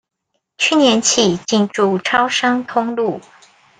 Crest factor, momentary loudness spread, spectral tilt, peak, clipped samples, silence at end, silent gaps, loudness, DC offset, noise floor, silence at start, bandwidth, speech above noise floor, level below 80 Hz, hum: 16 dB; 8 LU; -3 dB/octave; 0 dBFS; under 0.1%; 0.6 s; none; -15 LUFS; under 0.1%; -73 dBFS; 0.6 s; 10 kHz; 57 dB; -58 dBFS; none